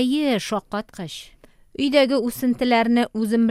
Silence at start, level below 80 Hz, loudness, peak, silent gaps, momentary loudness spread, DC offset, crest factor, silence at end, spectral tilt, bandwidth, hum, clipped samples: 0 s; -54 dBFS; -21 LUFS; -4 dBFS; none; 16 LU; under 0.1%; 18 dB; 0 s; -5 dB/octave; 15 kHz; none; under 0.1%